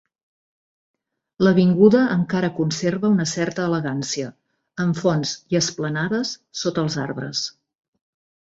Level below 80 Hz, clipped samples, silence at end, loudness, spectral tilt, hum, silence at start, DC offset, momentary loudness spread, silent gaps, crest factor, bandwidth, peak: -60 dBFS; under 0.1%; 1.05 s; -21 LUFS; -5.5 dB/octave; none; 1.4 s; under 0.1%; 12 LU; none; 20 dB; 8 kHz; -2 dBFS